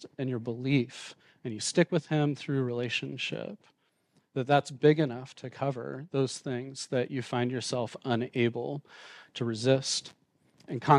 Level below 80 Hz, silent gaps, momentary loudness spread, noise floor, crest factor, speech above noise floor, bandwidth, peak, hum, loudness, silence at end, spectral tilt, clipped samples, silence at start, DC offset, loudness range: -76 dBFS; none; 15 LU; -71 dBFS; 22 dB; 41 dB; 11 kHz; -8 dBFS; none; -31 LUFS; 0 s; -5.5 dB/octave; under 0.1%; 0 s; under 0.1%; 3 LU